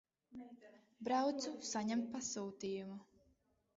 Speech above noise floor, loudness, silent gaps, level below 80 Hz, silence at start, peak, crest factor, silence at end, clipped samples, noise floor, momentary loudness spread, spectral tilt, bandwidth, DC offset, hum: 36 dB; -41 LUFS; none; -80 dBFS; 0.3 s; -26 dBFS; 16 dB; 0.75 s; under 0.1%; -77 dBFS; 19 LU; -4 dB/octave; 7.6 kHz; under 0.1%; none